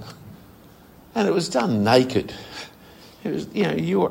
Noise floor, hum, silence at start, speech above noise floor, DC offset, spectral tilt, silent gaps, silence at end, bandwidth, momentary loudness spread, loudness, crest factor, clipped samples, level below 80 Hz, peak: -48 dBFS; none; 0 s; 27 dB; under 0.1%; -5.5 dB/octave; none; 0 s; 16 kHz; 20 LU; -22 LUFS; 22 dB; under 0.1%; -56 dBFS; -2 dBFS